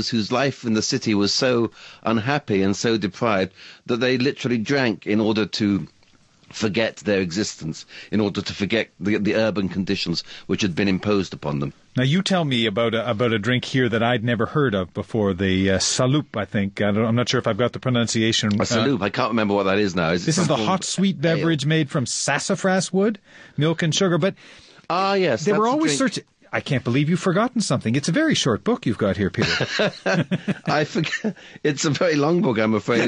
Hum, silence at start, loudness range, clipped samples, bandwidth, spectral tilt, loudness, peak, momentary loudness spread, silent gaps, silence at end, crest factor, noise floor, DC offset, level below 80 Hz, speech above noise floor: none; 0 s; 3 LU; under 0.1%; 10.5 kHz; -5 dB/octave; -21 LUFS; -4 dBFS; 7 LU; none; 0 s; 16 dB; -55 dBFS; under 0.1%; -50 dBFS; 34 dB